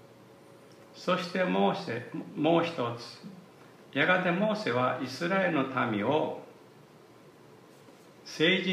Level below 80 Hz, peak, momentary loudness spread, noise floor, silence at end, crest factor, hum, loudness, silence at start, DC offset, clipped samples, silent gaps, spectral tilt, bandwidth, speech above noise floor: -80 dBFS; -12 dBFS; 16 LU; -55 dBFS; 0 s; 18 dB; none; -29 LUFS; 0.7 s; under 0.1%; under 0.1%; none; -6 dB/octave; 14.5 kHz; 26 dB